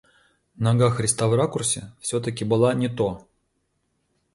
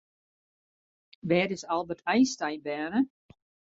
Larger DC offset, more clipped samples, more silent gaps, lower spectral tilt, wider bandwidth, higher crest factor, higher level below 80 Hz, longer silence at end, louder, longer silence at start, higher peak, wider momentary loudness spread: neither; neither; neither; about the same, -5 dB/octave vs -5 dB/octave; first, 11.5 kHz vs 7.8 kHz; about the same, 18 dB vs 20 dB; first, -54 dBFS vs -70 dBFS; first, 1.15 s vs 0.7 s; first, -23 LUFS vs -29 LUFS; second, 0.6 s vs 1.25 s; first, -6 dBFS vs -10 dBFS; about the same, 7 LU vs 8 LU